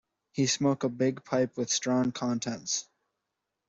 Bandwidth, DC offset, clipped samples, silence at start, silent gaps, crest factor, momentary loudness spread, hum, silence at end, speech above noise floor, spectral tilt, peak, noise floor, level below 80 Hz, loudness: 8 kHz; under 0.1%; under 0.1%; 0.35 s; none; 16 dB; 6 LU; none; 0.85 s; 56 dB; -4 dB/octave; -16 dBFS; -85 dBFS; -70 dBFS; -29 LUFS